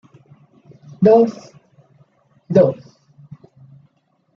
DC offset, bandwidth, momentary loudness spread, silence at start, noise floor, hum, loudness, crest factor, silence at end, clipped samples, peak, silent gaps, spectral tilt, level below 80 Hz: under 0.1%; 7 kHz; 20 LU; 1 s; -64 dBFS; none; -15 LUFS; 18 dB; 1.6 s; under 0.1%; -2 dBFS; none; -9 dB/octave; -60 dBFS